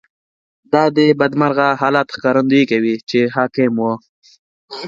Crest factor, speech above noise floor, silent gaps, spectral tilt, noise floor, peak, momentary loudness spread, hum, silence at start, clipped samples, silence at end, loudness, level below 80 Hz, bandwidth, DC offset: 16 dB; over 75 dB; 3.03-3.07 s, 4.09-4.22 s, 4.39-4.68 s; -7 dB/octave; under -90 dBFS; 0 dBFS; 6 LU; none; 0.7 s; under 0.1%; 0 s; -15 LUFS; -62 dBFS; 7.6 kHz; under 0.1%